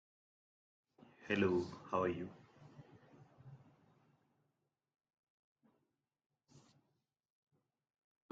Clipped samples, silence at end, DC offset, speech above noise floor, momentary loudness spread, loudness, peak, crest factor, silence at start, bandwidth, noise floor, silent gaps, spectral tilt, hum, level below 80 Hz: under 0.1%; 4.75 s; under 0.1%; 49 dB; 26 LU; -39 LUFS; -22 dBFS; 26 dB; 1.2 s; 7.6 kHz; -87 dBFS; none; -7 dB/octave; none; -82 dBFS